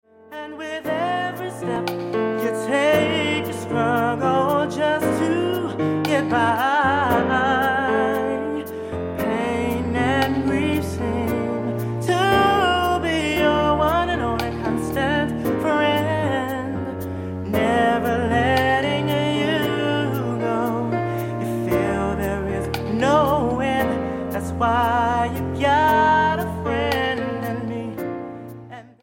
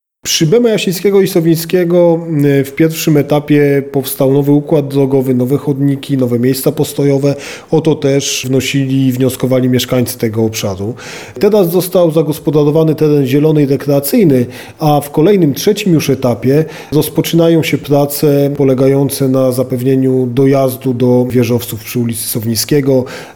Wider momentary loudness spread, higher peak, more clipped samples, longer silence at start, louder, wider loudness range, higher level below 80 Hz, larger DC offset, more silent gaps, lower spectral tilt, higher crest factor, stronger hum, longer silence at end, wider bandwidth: first, 9 LU vs 5 LU; second, -4 dBFS vs 0 dBFS; neither; about the same, 0.3 s vs 0.25 s; second, -21 LUFS vs -12 LUFS; about the same, 3 LU vs 2 LU; first, -42 dBFS vs -48 dBFS; second, under 0.1% vs 0.3%; neither; about the same, -6 dB/octave vs -6 dB/octave; first, 16 dB vs 10 dB; neither; about the same, 0.15 s vs 0.05 s; second, 17 kHz vs over 20 kHz